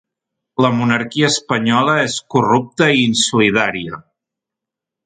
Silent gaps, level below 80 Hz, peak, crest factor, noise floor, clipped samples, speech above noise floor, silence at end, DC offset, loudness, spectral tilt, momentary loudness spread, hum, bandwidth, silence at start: none; -56 dBFS; 0 dBFS; 16 dB; -84 dBFS; under 0.1%; 69 dB; 1.05 s; under 0.1%; -15 LUFS; -4 dB/octave; 9 LU; none; 9.4 kHz; 0.6 s